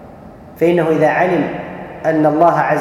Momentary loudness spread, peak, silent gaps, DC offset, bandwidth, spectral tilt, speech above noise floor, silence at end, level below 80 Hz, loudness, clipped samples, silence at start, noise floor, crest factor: 10 LU; 0 dBFS; none; under 0.1%; 15 kHz; -7.5 dB/octave; 23 dB; 0 s; -50 dBFS; -14 LUFS; under 0.1%; 0 s; -37 dBFS; 14 dB